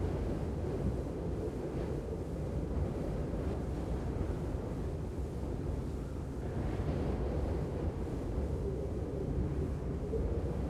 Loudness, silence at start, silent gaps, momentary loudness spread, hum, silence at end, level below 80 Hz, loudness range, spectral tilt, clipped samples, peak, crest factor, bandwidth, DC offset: -38 LUFS; 0 s; none; 4 LU; none; 0 s; -40 dBFS; 2 LU; -8.5 dB/octave; under 0.1%; -22 dBFS; 14 dB; 12.5 kHz; under 0.1%